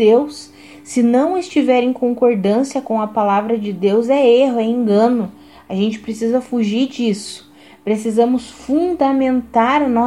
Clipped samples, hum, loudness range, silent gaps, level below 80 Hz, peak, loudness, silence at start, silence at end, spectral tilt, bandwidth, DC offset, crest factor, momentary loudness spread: under 0.1%; none; 4 LU; none; -54 dBFS; -2 dBFS; -16 LUFS; 0 s; 0 s; -6 dB/octave; 12 kHz; 0.1%; 14 dB; 9 LU